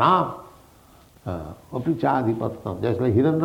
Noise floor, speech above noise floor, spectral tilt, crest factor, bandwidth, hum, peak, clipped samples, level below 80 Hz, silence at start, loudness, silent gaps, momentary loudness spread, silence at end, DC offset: -52 dBFS; 30 dB; -8.5 dB/octave; 18 dB; 16.5 kHz; none; -6 dBFS; under 0.1%; -52 dBFS; 0 s; -24 LUFS; none; 14 LU; 0 s; under 0.1%